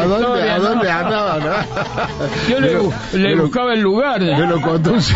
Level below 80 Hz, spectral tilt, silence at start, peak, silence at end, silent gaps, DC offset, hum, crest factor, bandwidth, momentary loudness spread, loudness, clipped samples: -40 dBFS; -6 dB/octave; 0 s; -2 dBFS; 0 s; none; under 0.1%; none; 14 dB; 8 kHz; 5 LU; -16 LUFS; under 0.1%